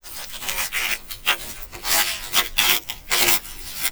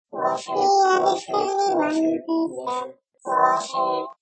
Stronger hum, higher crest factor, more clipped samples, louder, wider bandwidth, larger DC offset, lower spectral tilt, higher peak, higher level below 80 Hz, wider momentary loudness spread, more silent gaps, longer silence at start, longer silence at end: neither; first, 22 dB vs 16 dB; neither; about the same, -20 LUFS vs -22 LUFS; first, over 20 kHz vs 8.8 kHz; first, 0.3% vs under 0.1%; second, 0.5 dB/octave vs -3.5 dB/octave; first, -2 dBFS vs -6 dBFS; first, -42 dBFS vs -80 dBFS; about the same, 12 LU vs 10 LU; neither; about the same, 0.05 s vs 0.15 s; about the same, 0 s vs 0.1 s